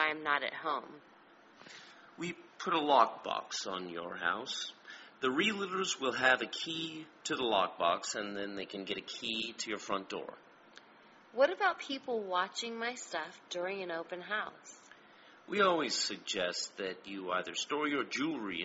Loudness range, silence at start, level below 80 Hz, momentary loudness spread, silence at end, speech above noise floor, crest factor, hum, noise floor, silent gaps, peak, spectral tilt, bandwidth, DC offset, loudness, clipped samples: 4 LU; 0 s; -78 dBFS; 14 LU; 0 s; 25 dB; 24 dB; none; -60 dBFS; none; -12 dBFS; -1 dB/octave; 8 kHz; under 0.1%; -35 LUFS; under 0.1%